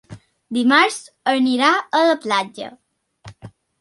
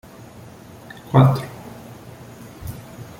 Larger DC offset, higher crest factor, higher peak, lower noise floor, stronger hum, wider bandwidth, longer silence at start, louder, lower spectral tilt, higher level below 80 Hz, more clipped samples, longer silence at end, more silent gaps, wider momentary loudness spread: neither; about the same, 18 dB vs 22 dB; about the same, -2 dBFS vs -2 dBFS; about the same, -44 dBFS vs -41 dBFS; neither; second, 11.5 kHz vs 16.5 kHz; second, 0.1 s vs 1.1 s; about the same, -17 LUFS vs -17 LUFS; second, -3.5 dB/octave vs -8 dB/octave; second, -62 dBFS vs -50 dBFS; neither; first, 0.3 s vs 0.15 s; neither; second, 14 LU vs 26 LU